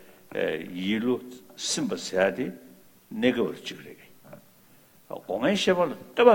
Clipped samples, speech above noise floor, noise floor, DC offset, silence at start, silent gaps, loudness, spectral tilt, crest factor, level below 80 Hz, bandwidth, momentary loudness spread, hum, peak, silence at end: under 0.1%; 31 dB; -56 dBFS; under 0.1%; 0.3 s; none; -27 LUFS; -4 dB/octave; 24 dB; -66 dBFS; 18.5 kHz; 18 LU; none; -4 dBFS; 0 s